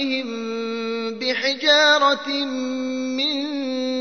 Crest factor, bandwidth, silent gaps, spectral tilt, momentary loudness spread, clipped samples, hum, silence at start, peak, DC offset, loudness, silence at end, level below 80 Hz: 18 dB; 6.6 kHz; none; -2 dB/octave; 12 LU; under 0.1%; none; 0 s; -4 dBFS; 0.2%; -20 LUFS; 0 s; -72 dBFS